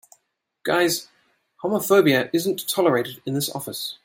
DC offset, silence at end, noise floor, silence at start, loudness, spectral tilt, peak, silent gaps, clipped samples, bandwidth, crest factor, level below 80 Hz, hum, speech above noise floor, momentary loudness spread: under 0.1%; 0.1 s; -73 dBFS; 0.65 s; -22 LUFS; -4 dB/octave; -6 dBFS; none; under 0.1%; 16.5 kHz; 18 dB; -68 dBFS; none; 51 dB; 12 LU